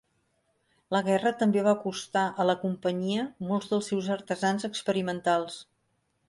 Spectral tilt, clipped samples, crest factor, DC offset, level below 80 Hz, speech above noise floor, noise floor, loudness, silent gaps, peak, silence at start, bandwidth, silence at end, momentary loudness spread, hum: -5.5 dB/octave; under 0.1%; 18 dB; under 0.1%; -72 dBFS; 47 dB; -74 dBFS; -28 LUFS; none; -12 dBFS; 0.9 s; 11.5 kHz; 0.65 s; 6 LU; none